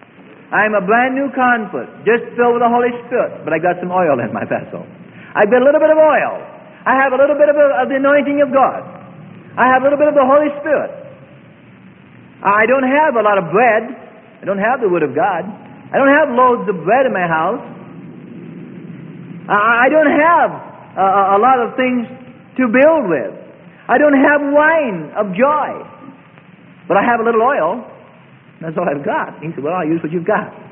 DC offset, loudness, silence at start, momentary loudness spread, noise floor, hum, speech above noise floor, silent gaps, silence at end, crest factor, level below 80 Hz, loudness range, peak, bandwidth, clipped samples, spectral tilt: under 0.1%; -14 LUFS; 0.5 s; 19 LU; -43 dBFS; none; 30 dB; none; 0.05 s; 14 dB; -60 dBFS; 4 LU; 0 dBFS; 3.5 kHz; under 0.1%; -11 dB/octave